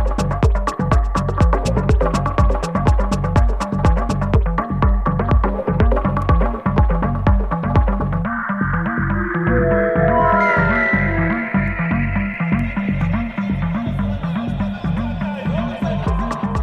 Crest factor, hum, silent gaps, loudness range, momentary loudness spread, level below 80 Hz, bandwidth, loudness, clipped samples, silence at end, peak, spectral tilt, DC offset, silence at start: 16 dB; none; none; 5 LU; 6 LU; -22 dBFS; 9.4 kHz; -18 LUFS; under 0.1%; 0 s; -2 dBFS; -8 dB/octave; under 0.1%; 0 s